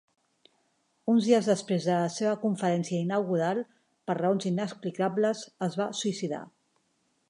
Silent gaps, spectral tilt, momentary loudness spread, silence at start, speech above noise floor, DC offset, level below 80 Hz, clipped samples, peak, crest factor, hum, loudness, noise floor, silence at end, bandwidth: none; -6 dB/octave; 10 LU; 1.05 s; 45 dB; under 0.1%; -80 dBFS; under 0.1%; -10 dBFS; 18 dB; none; -28 LUFS; -73 dBFS; 0.8 s; 11 kHz